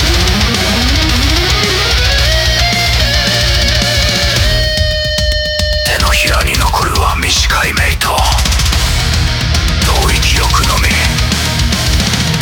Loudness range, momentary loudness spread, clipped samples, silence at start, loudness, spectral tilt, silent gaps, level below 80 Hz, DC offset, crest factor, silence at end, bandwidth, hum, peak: 1 LU; 3 LU; under 0.1%; 0 s; -11 LUFS; -3 dB/octave; none; -16 dBFS; under 0.1%; 10 dB; 0 s; 18.5 kHz; none; 0 dBFS